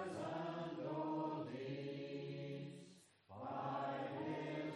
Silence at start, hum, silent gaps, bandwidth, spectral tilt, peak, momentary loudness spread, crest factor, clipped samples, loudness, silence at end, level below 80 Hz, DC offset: 0 s; none; none; 11.5 kHz; -7 dB/octave; -32 dBFS; 9 LU; 14 dB; under 0.1%; -46 LUFS; 0 s; -88 dBFS; under 0.1%